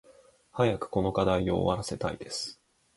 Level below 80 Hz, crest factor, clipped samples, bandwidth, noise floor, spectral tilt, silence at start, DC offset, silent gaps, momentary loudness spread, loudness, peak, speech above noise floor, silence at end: -50 dBFS; 20 dB; under 0.1%; 11.5 kHz; -59 dBFS; -5.5 dB/octave; 0.55 s; under 0.1%; none; 9 LU; -29 LUFS; -10 dBFS; 30 dB; 0.45 s